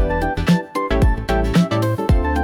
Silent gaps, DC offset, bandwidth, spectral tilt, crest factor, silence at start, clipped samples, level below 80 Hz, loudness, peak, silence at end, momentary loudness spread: none; under 0.1%; 17.5 kHz; -7 dB/octave; 10 dB; 0 s; under 0.1%; -22 dBFS; -19 LUFS; -6 dBFS; 0 s; 3 LU